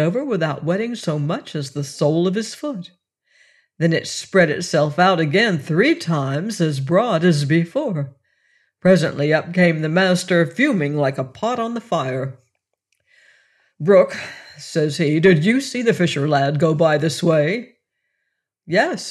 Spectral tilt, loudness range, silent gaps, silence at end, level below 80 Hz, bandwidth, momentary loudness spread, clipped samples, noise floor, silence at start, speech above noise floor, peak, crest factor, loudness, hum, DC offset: -6 dB/octave; 5 LU; none; 0 s; -64 dBFS; 12.5 kHz; 10 LU; under 0.1%; -76 dBFS; 0 s; 58 dB; -2 dBFS; 16 dB; -19 LUFS; none; under 0.1%